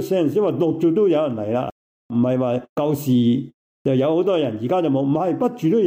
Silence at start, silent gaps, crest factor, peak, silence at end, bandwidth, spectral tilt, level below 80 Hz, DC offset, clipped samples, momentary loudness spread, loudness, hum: 0 s; 1.72-2.09 s, 2.69-2.76 s, 3.54-3.85 s; 12 dB; -8 dBFS; 0 s; 16 kHz; -8 dB/octave; -62 dBFS; under 0.1%; under 0.1%; 7 LU; -20 LUFS; none